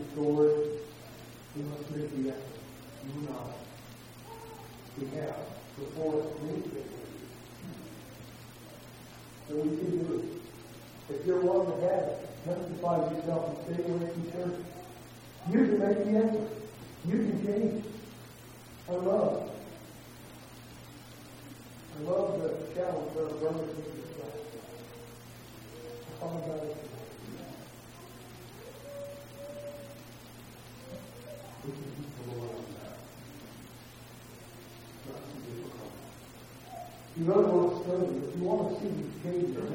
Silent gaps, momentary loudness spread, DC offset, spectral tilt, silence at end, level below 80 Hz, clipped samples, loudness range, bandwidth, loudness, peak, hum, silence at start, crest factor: none; 21 LU; under 0.1%; -7 dB/octave; 0 s; -64 dBFS; under 0.1%; 14 LU; 16.5 kHz; -33 LUFS; -12 dBFS; none; 0 s; 24 dB